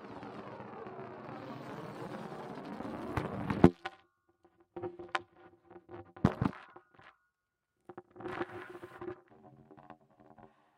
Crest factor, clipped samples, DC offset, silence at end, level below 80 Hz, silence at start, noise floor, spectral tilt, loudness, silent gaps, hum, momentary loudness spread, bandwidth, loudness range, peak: 32 dB; under 0.1%; under 0.1%; 0.3 s; -58 dBFS; 0 s; -85 dBFS; -8 dB/octave; -37 LUFS; none; none; 24 LU; 15 kHz; 13 LU; -6 dBFS